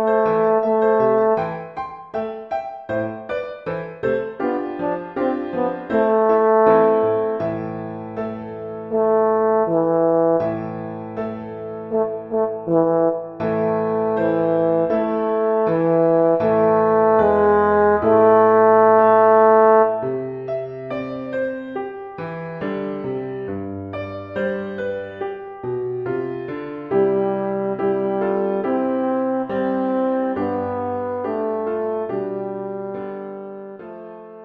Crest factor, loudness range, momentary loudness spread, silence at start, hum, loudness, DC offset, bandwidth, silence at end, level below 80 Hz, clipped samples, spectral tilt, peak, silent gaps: 18 dB; 12 LU; 15 LU; 0 s; none; -20 LUFS; under 0.1%; 5 kHz; 0 s; -56 dBFS; under 0.1%; -10 dB/octave; -2 dBFS; none